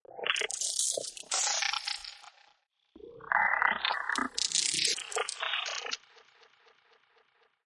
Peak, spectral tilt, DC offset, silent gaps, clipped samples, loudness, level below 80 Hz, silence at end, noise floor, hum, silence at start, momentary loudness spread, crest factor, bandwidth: -8 dBFS; 1.5 dB/octave; under 0.1%; none; under 0.1%; -30 LUFS; -72 dBFS; 1.7 s; -70 dBFS; none; 0.1 s; 11 LU; 26 dB; 11.5 kHz